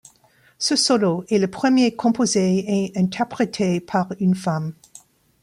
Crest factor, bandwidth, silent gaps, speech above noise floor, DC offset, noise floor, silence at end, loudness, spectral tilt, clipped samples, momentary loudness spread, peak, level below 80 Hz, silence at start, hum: 14 dB; 12 kHz; none; 37 dB; under 0.1%; -57 dBFS; 0.7 s; -20 LUFS; -5 dB/octave; under 0.1%; 6 LU; -6 dBFS; -62 dBFS; 0.6 s; none